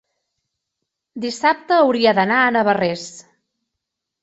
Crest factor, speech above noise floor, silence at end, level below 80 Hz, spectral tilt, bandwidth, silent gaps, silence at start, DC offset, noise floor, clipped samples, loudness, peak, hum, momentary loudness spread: 18 dB; 64 dB; 1.05 s; -64 dBFS; -4.5 dB/octave; 8.2 kHz; none; 1.15 s; under 0.1%; -81 dBFS; under 0.1%; -17 LUFS; -2 dBFS; none; 15 LU